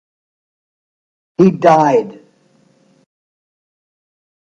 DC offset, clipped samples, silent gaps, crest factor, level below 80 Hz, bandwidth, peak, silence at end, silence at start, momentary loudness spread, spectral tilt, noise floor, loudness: under 0.1%; under 0.1%; none; 18 dB; -64 dBFS; 7.6 kHz; 0 dBFS; 2.35 s; 1.4 s; 19 LU; -7.5 dB/octave; -54 dBFS; -12 LUFS